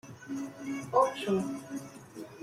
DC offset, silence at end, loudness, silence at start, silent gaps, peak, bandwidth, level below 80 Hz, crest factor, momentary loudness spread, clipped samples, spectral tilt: under 0.1%; 0 s; -33 LUFS; 0.05 s; none; -12 dBFS; 15.5 kHz; -74 dBFS; 20 dB; 19 LU; under 0.1%; -5.5 dB/octave